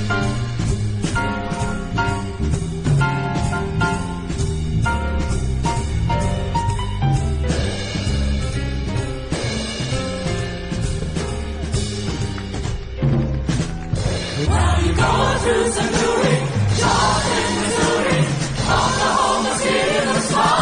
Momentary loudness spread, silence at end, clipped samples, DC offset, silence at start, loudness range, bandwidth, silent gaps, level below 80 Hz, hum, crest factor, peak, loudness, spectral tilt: 7 LU; 0 s; under 0.1%; under 0.1%; 0 s; 6 LU; 10.5 kHz; none; -28 dBFS; none; 16 dB; -2 dBFS; -20 LUFS; -5 dB/octave